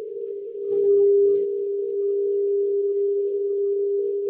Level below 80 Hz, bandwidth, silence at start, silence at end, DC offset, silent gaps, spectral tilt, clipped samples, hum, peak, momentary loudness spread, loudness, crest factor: -78 dBFS; 1.2 kHz; 0 s; 0 s; under 0.1%; none; -11.5 dB/octave; under 0.1%; none; -12 dBFS; 10 LU; -22 LUFS; 10 dB